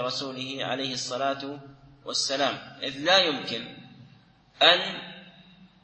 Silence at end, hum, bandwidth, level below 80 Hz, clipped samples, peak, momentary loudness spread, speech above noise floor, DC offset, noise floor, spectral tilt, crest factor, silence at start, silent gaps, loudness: 0.2 s; none; 8.8 kHz; -68 dBFS; under 0.1%; -2 dBFS; 21 LU; 30 dB; under 0.1%; -57 dBFS; -2 dB/octave; 26 dB; 0 s; none; -25 LUFS